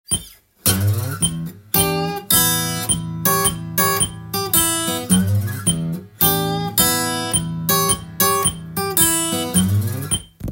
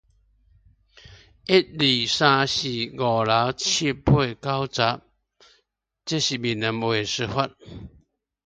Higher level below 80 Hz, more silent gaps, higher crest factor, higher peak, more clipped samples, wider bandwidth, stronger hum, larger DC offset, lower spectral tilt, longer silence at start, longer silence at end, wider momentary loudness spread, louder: first, -42 dBFS vs -48 dBFS; neither; about the same, 18 dB vs 22 dB; about the same, 0 dBFS vs -2 dBFS; neither; first, 17 kHz vs 9.4 kHz; neither; neither; about the same, -3 dB/octave vs -4 dB/octave; second, 0.1 s vs 1.1 s; second, 0 s vs 0.55 s; second, 7 LU vs 12 LU; first, -18 LUFS vs -22 LUFS